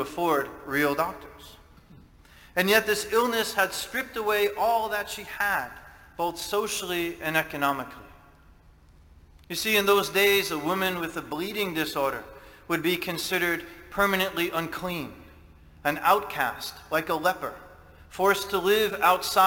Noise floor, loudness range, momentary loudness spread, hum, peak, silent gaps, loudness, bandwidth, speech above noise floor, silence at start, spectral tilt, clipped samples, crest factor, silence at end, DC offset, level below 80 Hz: -54 dBFS; 4 LU; 13 LU; none; -4 dBFS; none; -26 LUFS; 17 kHz; 28 dB; 0 s; -3 dB/octave; under 0.1%; 22 dB; 0 s; under 0.1%; -56 dBFS